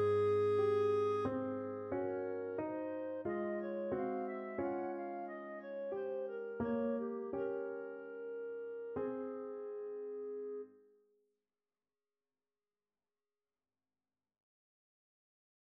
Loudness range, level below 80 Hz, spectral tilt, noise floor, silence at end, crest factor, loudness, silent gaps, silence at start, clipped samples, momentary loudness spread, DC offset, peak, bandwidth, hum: 11 LU; -76 dBFS; -8.5 dB/octave; under -90 dBFS; 4.95 s; 16 dB; -40 LUFS; none; 0 s; under 0.1%; 12 LU; under 0.1%; -24 dBFS; 6.2 kHz; none